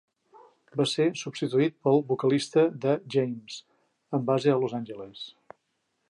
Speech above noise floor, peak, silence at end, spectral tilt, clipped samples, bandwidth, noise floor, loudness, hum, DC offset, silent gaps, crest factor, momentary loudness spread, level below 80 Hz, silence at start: 51 dB; -10 dBFS; 0.85 s; -6 dB/octave; under 0.1%; 11 kHz; -77 dBFS; -26 LUFS; none; under 0.1%; none; 18 dB; 16 LU; -76 dBFS; 0.75 s